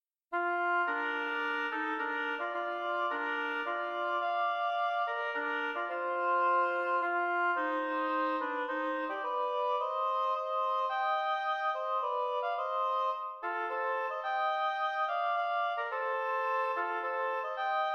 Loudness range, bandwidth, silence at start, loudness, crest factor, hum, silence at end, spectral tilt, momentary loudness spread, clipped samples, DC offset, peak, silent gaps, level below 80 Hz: 2 LU; 7 kHz; 0.3 s; -32 LUFS; 12 dB; none; 0 s; -2.5 dB/octave; 4 LU; under 0.1%; under 0.1%; -20 dBFS; none; -88 dBFS